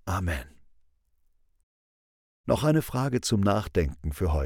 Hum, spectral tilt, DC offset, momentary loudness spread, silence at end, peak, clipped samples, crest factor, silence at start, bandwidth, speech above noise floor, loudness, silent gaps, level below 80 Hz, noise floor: none; -6 dB/octave; under 0.1%; 8 LU; 0 s; -10 dBFS; under 0.1%; 20 dB; 0.05 s; 18 kHz; 41 dB; -27 LUFS; 1.63-2.44 s; -40 dBFS; -67 dBFS